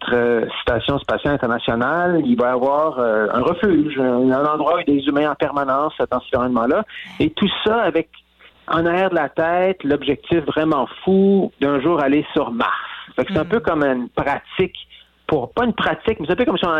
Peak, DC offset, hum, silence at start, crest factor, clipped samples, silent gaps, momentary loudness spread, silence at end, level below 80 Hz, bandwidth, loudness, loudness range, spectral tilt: -8 dBFS; under 0.1%; none; 0 s; 12 dB; under 0.1%; none; 5 LU; 0 s; -46 dBFS; 6.6 kHz; -19 LUFS; 3 LU; -8 dB/octave